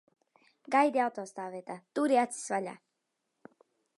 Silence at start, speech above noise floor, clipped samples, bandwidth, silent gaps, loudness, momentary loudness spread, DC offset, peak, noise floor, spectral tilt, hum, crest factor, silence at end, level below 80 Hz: 0.7 s; 52 dB; under 0.1%; 11.5 kHz; none; -31 LUFS; 14 LU; under 0.1%; -12 dBFS; -83 dBFS; -4 dB/octave; none; 22 dB; 1.2 s; -88 dBFS